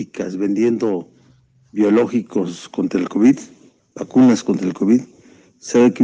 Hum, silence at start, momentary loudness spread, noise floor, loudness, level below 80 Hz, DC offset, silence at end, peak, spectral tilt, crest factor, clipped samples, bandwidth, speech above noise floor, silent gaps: none; 0 s; 12 LU; -53 dBFS; -18 LUFS; -64 dBFS; under 0.1%; 0 s; -2 dBFS; -6.5 dB/octave; 16 dB; under 0.1%; 8.8 kHz; 37 dB; none